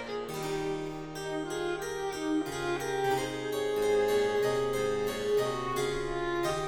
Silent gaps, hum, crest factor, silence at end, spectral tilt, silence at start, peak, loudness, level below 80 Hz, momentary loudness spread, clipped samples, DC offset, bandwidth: none; none; 14 dB; 0 s; -4.5 dB/octave; 0 s; -18 dBFS; -31 LUFS; -50 dBFS; 8 LU; under 0.1%; under 0.1%; 19 kHz